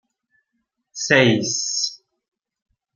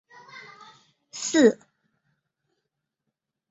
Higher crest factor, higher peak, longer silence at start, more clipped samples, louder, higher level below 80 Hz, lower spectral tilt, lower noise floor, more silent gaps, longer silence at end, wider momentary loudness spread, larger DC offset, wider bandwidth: about the same, 22 dB vs 24 dB; first, -2 dBFS vs -6 dBFS; first, 0.95 s vs 0.35 s; neither; first, -19 LUFS vs -22 LUFS; first, -64 dBFS vs -74 dBFS; about the same, -3 dB/octave vs -3.5 dB/octave; second, -75 dBFS vs -83 dBFS; neither; second, 1 s vs 1.95 s; second, 13 LU vs 25 LU; neither; first, 10.5 kHz vs 8 kHz